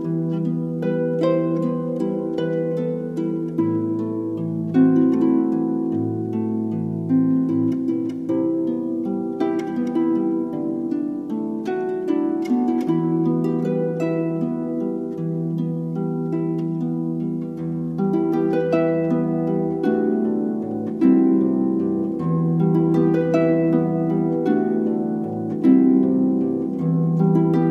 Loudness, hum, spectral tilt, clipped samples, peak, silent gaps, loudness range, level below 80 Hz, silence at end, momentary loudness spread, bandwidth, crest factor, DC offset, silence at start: -21 LUFS; none; -10 dB/octave; under 0.1%; -4 dBFS; none; 4 LU; -60 dBFS; 0 s; 8 LU; 6.2 kHz; 16 dB; under 0.1%; 0 s